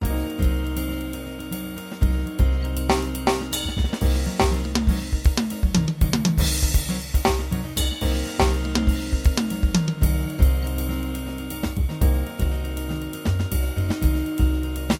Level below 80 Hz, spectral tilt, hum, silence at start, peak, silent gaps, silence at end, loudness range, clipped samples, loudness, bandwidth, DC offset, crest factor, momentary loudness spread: -24 dBFS; -5.5 dB/octave; none; 0 s; -6 dBFS; none; 0 s; 3 LU; under 0.1%; -24 LUFS; 17.5 kHz; under 0.1%; 16 dB; 7 LU